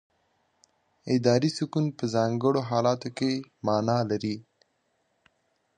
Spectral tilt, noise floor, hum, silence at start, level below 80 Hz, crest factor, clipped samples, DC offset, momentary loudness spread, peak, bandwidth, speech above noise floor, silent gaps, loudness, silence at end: -6.5 dB/octave; -73 dBFS; none; 1.05 s; -66 dBFS; 20 dB; under 0.1%; under 0.1%; 7 LU; -8 dBFS; 9.8 kHz; 47 dB; none; -27 LUFS; 1.35 s